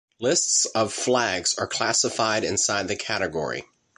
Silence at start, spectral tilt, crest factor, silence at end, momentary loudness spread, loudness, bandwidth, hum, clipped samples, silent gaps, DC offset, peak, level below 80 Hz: 0.2 s; -1.5 dB/octave; 18 dB; 0.35 s; 7 LU; -23 LUFS; 11.5 kHz; none; under 0.1%; none; under 0.1%; -6 dBFS; -56 dBFS